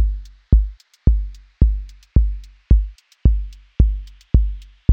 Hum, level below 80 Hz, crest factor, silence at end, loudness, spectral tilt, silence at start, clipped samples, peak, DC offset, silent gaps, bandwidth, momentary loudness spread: none; -18 dBFS; 16 dB; 0 s; -21 LUFS; -10 dB/octave; 0 s; under 0.1%; 0 dBFS; under 0.1%; none; 1.3 kHz; 14 LU